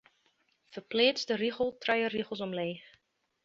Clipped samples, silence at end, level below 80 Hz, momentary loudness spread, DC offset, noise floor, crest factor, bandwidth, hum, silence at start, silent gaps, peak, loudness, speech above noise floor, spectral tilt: under 0.1%; 0.65 s; -72 dBFS; 17 LU; under 0.1%; -73 dBFS; 22 dB; 7.6 kHz; none; 0.7 s; none; -12 dBFS; -31 LUFS; 42 dB; -4 dB/octave